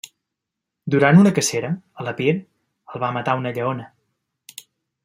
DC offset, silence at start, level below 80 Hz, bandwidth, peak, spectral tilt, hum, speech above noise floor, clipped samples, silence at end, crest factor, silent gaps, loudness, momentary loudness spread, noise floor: under 0.1%; 0.85 s; -64 dBFS; 16 kHz; -2 dBFS; -5.5 dB/octave; none; 64 dB; under 0.1%; 1.2 s; 20 dB; none; -20 LUFS; 25 LU; -83 dBFS